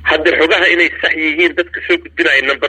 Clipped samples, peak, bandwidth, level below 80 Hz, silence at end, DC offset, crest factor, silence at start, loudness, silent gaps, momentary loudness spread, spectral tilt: under 0.1%; 0 dBFS; 9 kHz; -44 dBFS; 0 s; under 0.1%; 14 dB; 0 s; -12 LUFS; none; 6 LU; -3.5 dB/octave